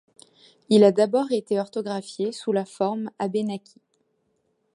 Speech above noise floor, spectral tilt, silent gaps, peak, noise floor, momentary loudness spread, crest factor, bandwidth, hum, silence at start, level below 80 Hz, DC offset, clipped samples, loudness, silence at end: 48 dB; -6 dB/octave; none; -4 dBFS; -71 dBFS; 12 LU; 20 dB; 11.5 kHz; none; 0.7 s; -76 dBFS; under 0.1%; under 0.1%; -23 LUFS; 1.15 s